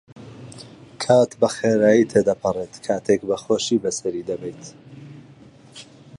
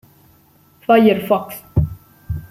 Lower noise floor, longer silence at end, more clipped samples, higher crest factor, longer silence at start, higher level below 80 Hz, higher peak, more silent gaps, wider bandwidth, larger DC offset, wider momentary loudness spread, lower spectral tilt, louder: second, -47 dBFS vs -52 dBFS; first, 0.35 s vs 0.05 s; neither; about the same, 18 dB vs 18 dB; second, 0.15 s vs 0.9 s; second, -58 dBFS vs -36 dBFS; about the same, -4 dBFS vs -2 dBFS; neither; second, 11.5 kHz vs 16 kHz; neither; first, 25 LU vs 17 LU; second, -5 dB/octave vs -7.5 dB/octave; second, -20 LUFS vs -17 LUFS